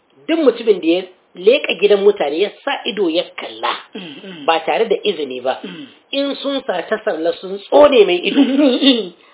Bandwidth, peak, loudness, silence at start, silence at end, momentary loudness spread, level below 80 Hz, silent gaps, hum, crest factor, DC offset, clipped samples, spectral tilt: 4 kHz; 0 dBFS; -16 LUFS; 0.3 s; 0.2 s; 14 LU; -60 dBFS; none; none; 16 dB; under 0.1%; under 0.1%; -8.5 dB/octave